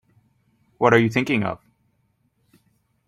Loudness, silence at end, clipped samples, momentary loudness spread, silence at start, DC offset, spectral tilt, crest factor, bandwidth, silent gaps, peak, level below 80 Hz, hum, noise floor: -20 LUFS; 1.5 s; under 0.1%; 12 LU; 0.8 s; under 0.1%; -6.5 dB/octave; 22 dB; 14 kHz; none; -2 dBFS; -60 dBFS; none; -68 dBFS